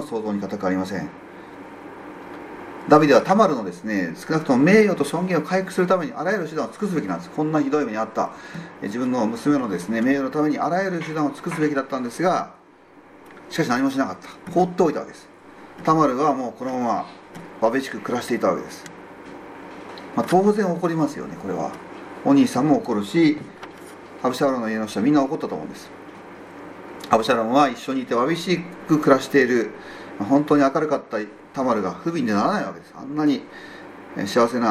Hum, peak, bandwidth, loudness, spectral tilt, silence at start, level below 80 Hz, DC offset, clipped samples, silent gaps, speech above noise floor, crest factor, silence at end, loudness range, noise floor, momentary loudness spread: none; -2 dBFS; 15 kHz; -22 LUFS; -6 dB/octave; 0 s; -64 dBFS; under 0.1%; under 0.1%; none; 28 dB; 20 dB; 0 s; 5 LU; -49 dBFS; 21 LU